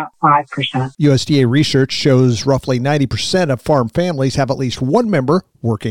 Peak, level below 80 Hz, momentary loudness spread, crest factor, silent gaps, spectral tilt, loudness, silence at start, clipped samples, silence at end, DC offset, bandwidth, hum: 0 dBFS; -42 dBFS; 6 LU; 14 dB; none; -6 dB/octave; -15 LUFS; 0 s; under 0.1%; 0 s; 0.7%; 12 kHz; none